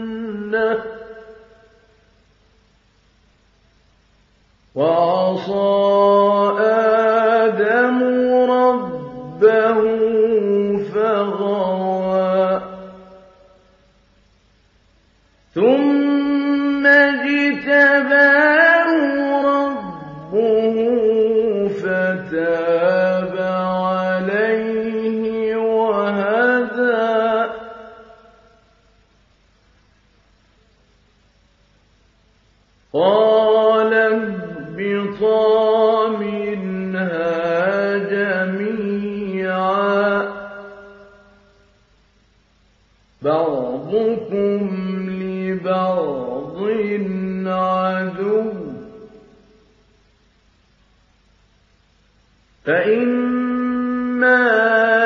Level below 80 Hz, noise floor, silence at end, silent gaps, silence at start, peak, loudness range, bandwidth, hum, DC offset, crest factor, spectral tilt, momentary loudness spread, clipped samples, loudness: -58 dBFS; -57 dBFS; 0 s; none; 0 s; -2 dBFS; 11 LU; 6.6 kHz; none; under 0.1%; 18 dB; -7.5 dB/octave; 11 LU; under 0.1%; -17 LUFS